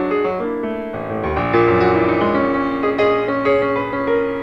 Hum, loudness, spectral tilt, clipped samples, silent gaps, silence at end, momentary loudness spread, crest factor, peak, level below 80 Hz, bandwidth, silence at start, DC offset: none; -18 LUFS; -8 dB/octave; under 0.1%; none; 0 s; 8 LU; 14 dB; -4 dBFS; -42 dBFS; 7 kHz; 0 s; under 0.1%